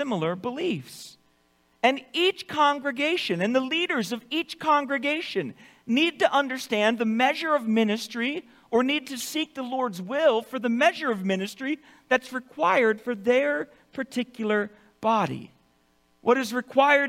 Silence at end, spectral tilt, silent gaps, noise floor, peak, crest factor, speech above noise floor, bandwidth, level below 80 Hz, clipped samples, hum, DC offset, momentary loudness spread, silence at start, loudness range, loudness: 0 s; -4.5 dB/octave; none; -65 dBFS; -6 dBFS; 20 dB; 40 dB; 16.5 kHz; -72 dBFS; under 0.1%; none; under 0.1%; 9 LU; 0 s; 2 LU; -25 LUFS